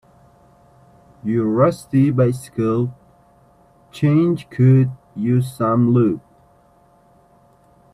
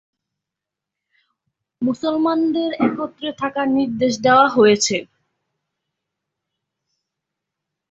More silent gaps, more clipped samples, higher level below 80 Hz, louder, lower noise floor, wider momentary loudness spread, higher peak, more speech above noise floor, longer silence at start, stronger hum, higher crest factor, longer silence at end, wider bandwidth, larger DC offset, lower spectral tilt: neither; neither; first, -56 dBFS vs -62 dBFS; about the same, -18 LUFS vs -18 LUFS; second, -54 dBFS vs -85 dBFS; second, 8 LU vs 12 LU; about the same, -2 dBFS vs -2 dBFS; second, 37 dB vs 67 dB; second, 1.25 s vs 1.8 s; neither; about the same, 16 dB vs 18 dB; second, 1.75 s vs 2.85 s; first, 12.5 kHz vs 8.4 kHz; neither; first, -9 dB/octave vs -4 dB/octave